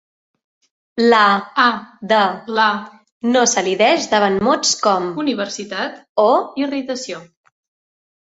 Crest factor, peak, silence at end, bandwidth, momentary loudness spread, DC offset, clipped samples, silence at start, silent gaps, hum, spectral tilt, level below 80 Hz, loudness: 18 dB; 0 dBFS; 1.05 s; 8 kHz; 11 LU; under 0.1%; under 0.1%; 0.95 s; 3.12-3.21 s, 6.09-6.16 s; none; -2.5 dB/octave; -60 dBFS; -17 LUFS